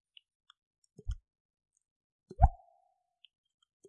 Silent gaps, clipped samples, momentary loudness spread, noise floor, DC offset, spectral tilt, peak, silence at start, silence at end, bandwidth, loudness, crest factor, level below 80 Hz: 1.40-1.54 s, 1.91-2.19 s; under 0.1%; 20 LU; -75 dBFS; under 0.1%; -8.5 dB/octave; -6 dBFS; 1.05 s; 1.4 s; 7 kHz; -33 LUFS; 30 dB; -40 dBFS